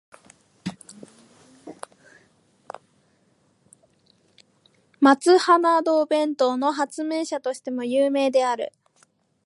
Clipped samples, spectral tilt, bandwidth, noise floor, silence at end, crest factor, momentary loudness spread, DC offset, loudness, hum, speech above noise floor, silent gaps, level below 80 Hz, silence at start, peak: under 0.1%; -4 dB/octave; 11.5 kHz; -64 dBFS; 0.8 s; 22 dB; 26 LU; under 0.1%; -21 LUFS; none; 44 dB; none; -76 dBFS; 0.65 s; -4 dBFS